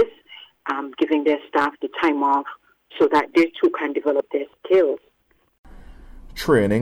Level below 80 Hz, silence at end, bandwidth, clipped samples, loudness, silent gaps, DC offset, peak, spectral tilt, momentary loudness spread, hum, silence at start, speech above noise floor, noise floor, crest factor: -48 dBFS; 0 s; 14.5 kHz; under 0.1%; -21 LUFS; 5.58-5.64 s; under 0.1%; -6 dBFS; -6.5 dB/octave; 13 LU; none; 0 s; 44 dB; -64 dBFS; 16 dB